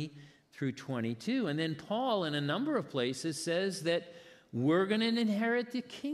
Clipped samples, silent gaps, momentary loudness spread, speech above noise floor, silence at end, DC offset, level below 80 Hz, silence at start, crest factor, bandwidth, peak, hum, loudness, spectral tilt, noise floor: under 0.1%; none; 9 LU; 23 dB; 0 s; under 0.1%; -82 dBFS; 0 s; 16 dB; 13 kHz; -18 dBFS; none; -33 LUFS; -5.5 dB/octave; -56 dBFS